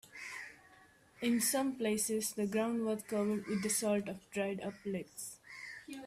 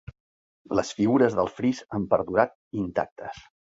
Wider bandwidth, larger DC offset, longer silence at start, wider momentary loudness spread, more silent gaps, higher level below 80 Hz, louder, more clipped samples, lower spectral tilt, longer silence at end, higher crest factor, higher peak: first, 16 kHz vs 8 kHz; neither; second, 0.05 s vs 0.7 s; about the same, 14 LU vs 14 LU; second, none vs 2.55-2.71 s, 3.12-3.16 s; second, -74 dBFS vs -56 dBFS; second, -36 LUFS vs -26 LUFS; neither; second, -4 dB/octave vs -6.5 dB/octave; second, 0 s vs 0.35 s; second, 16 dB vs 22 dB; second, -20 dBFS vs -4 dBFS